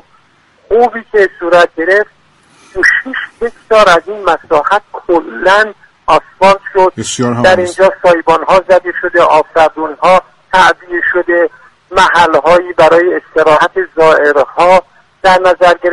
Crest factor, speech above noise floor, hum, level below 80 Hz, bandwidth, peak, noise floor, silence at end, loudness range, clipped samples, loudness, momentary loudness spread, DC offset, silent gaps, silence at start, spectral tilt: 10 dB; 40 dB; none; -40 dBFS; 11.5 kHz; 0 dBFS; -48 dBFS; 0 s; 3 LU; 0.7%; -9 LUFS; 7 LU; under 0.1%; none; 0.7 s; -4 dB/octave